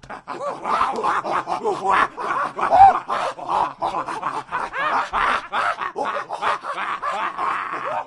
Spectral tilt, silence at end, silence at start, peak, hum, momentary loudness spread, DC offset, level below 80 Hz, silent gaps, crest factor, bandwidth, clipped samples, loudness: -3.5 dB/octave; 0 s; 0.05 s; 0 dBFS; none; 9 LU; under 0.1%; -52 dBFS; none; 22 dB; 11.5 kHz; under 0.1%; -21 LUFS